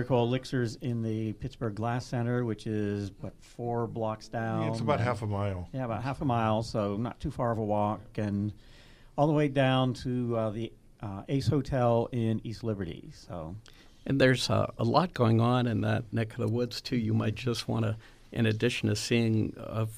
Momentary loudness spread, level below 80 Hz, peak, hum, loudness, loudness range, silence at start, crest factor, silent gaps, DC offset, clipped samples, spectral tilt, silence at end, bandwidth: 13 LU; -52 dBFS; -10 dBFS; none; -30 LUFS; 5 LU; 0 s; 20 dB; none; under 0.1%; under 0.1%; -6.5 dB/octave; 0 s; 14.5 kHz